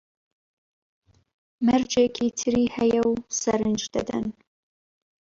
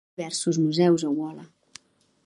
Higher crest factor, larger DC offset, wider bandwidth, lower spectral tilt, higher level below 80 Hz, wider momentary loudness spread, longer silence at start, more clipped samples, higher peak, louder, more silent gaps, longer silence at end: about the same, 16 dB vs 18 dB; neither; second, 7.6 kHz vs 11.5 kHz; second, -4 dB/octave vs -5.5 dB/octave; first, -56 dBFS vs -72 dBFS; second, 7 LU vs 14 LU; first, 1.6 s vs 0.2 s; neither; about the same, -10 dBFS vs -8 dBFS; about the same, -24 LUFS vs -24 LUFS; neither; about the same, 0.9 s vs 0.8 s